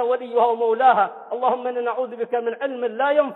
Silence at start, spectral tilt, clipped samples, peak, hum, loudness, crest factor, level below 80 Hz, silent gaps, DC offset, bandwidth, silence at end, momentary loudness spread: 0 s; -6.5 dB/octave; under 0.1%; -4 dBFS; none; -21 LUFS; 16 dB; -78 dBFS; none; under 0.1%; 4.1 kHz; 0 s; 9 LU